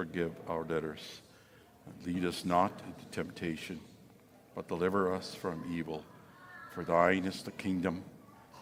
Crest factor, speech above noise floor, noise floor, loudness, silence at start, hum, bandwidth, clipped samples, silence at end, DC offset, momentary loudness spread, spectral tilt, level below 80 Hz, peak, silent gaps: 24 dB; 25 dB; -60 dBFS; -35 LUFS; 0 s; none; 16.5 kHz; under 0.1%; 0 s; under 0.1%; 20 LU; -6 dB/octave; -66 dBFS; -12 dBFS; none